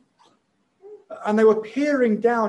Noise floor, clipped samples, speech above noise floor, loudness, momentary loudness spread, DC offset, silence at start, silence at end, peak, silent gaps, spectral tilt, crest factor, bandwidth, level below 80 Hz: -67 dBFS; under 0.1%; 48 dB; -20 LUFS; 12 LU; under 0.1%; 0.85 s; 0 s; -6 dBFS; none; -7 dB/octave; 16 dB; 9.4 kHz; -72 dBFS